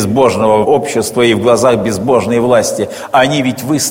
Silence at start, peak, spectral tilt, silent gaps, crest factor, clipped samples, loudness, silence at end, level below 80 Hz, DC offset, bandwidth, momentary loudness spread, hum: 0 s; 0 dBFS; -4.5 dB/octave; none; 12 dB; 0.1%; -11 LUFS; 0 s; -46 dBFS; under 0.1%; 17 kHz; 5 LU; none